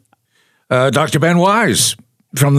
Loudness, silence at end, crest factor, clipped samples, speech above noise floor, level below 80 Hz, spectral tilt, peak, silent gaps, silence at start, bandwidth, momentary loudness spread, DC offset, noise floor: -13 LUFS; 0 s; 14 dB; under 0.1%; 47 dB; -56 dBFS; -4.5 dB/octave; 0 dBFS; none; 0.7 s; 15.5 kHz; 9 LU; under 0.1%; -60 dBFS